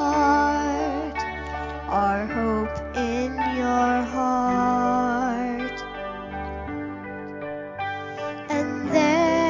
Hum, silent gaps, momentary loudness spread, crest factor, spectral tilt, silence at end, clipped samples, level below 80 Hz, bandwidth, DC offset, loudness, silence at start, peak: none; none; 13 LU; 16 dB; -5.5 dB/octave; 0 s; under 0.1%; -42 dBFS; 7.6 kHz; under 0.1%; -25 LUFS; 0 s; -8 dBFS